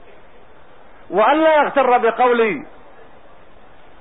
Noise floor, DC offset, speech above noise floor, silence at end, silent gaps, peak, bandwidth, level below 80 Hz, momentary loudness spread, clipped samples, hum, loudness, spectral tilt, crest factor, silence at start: -47 dBFS; 1%; 32 dB; 1.35 s; none; -4 dBFS; 4 kHz; -56 dBFS; 8 LU; under 0.1%; none; -15 LUFS; -9.5 dB/octave; 14 dB; 1.1 s